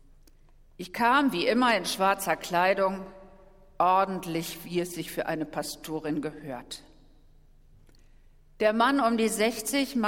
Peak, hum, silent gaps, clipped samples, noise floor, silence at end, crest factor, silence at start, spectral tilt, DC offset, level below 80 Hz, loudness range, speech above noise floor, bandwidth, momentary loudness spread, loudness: -10 dBFS; none; none; under 0.1%; -56 dBFS; 0 s; 20 dB; 0.8 s; -4 dB/octave; under 0.1%; -56 dBFS; 9 LU; 29 dB; 17.5 kHz; 15 LU; -27 LUFS